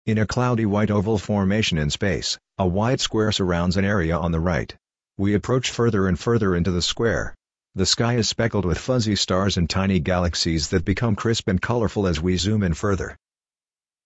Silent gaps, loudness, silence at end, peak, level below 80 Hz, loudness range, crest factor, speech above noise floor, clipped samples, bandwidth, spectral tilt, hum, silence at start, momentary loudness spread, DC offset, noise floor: none; -22 LUFS; 0.95 s; -6 dBFS; -38 dBFS; 1 LU; 16 dB; over 69 dB; under 0.1%; 8.2 kHz; -5 dB/octave; none; 0.05 s; 4 LU; under 0.1%; under -90 dBFS